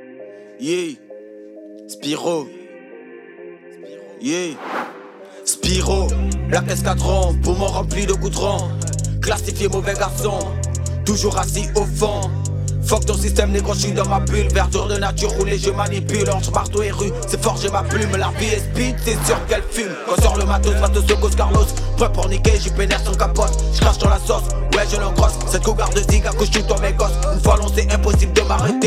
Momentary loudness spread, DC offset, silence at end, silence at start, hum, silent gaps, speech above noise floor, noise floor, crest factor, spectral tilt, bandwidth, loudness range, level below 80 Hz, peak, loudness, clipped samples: 14 LU; under 0.1%; 0 s; 0 s; none; none; 21 dB; -38 dBFS; 18 dB; -4.5 dB/octave; 15.5 kHz; 9 LU; -22 dBFS; 0 dBFS; -19 LUFS; under 0.1%